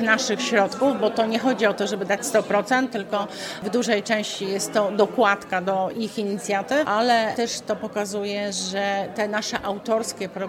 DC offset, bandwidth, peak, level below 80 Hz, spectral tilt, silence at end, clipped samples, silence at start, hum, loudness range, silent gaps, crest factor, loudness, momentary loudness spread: under 0.1%; 17 kHz; -4 dBFS; -64 dBFS; -3.5 dB/octave; 0 s; under 0.1%; 0 s; none; 2 LU; none; 20 dB; -23 LUFS; 7 LU